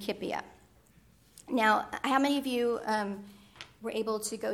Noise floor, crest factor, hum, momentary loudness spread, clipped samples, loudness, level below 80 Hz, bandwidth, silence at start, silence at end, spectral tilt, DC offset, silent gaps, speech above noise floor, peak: -62 dBFS; 20 dB; none; 17 LU; under 0.1%; -31 LUFS; -68 dBFS; 18 kHz; 0 s; 0 s; -3.5 dB/octave; under 0.1%; none; 31 dB; -12 dBFS